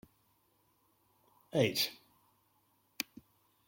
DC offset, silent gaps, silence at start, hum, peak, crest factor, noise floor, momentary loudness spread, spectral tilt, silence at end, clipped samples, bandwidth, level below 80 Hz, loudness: under 0.1%; none; 1.55 s; none; -14 dBFS; 26 dB; -74 dBFS; 11 LU; -4 dB/octave; 1.75 s; under 0.1%; 16.5 kHz; -78 dBFS; -35 LUFS